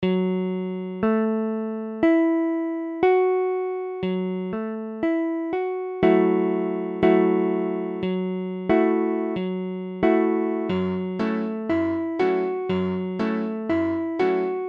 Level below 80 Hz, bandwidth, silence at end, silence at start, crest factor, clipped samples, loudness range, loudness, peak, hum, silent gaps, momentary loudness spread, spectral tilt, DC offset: -58 dBFS; 5.4 kHz; 0 s; 0 s; 16 dB; under 0.1%; 2 LU; -24 LUFS; -8 dBFS; none; none; 9 LU; -9.5 dB/octave; under 0.1%